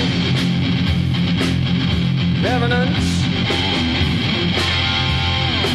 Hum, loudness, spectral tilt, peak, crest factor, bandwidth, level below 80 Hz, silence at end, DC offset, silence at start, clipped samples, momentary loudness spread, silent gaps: none; -17 LUFS; -5.5 dB/octave; -6 dBFS; 12 dB; 12.5 kHz; -32 dBFS; 0 s; 0.2%; 0 s; under 0.1%; 2 LU; none